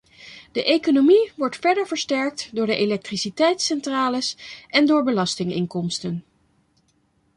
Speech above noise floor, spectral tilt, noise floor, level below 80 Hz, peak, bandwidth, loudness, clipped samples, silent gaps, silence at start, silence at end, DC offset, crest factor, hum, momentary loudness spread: 44 dB; -4.5 dB/octave; -65 dBFS; -64 dBFS; -4 dBFS; 11 kHz; -21 LUFS; under 0.1%; none; 0.2 s; 1.15 s; under 0.1%; 18 dB; none; 11 LU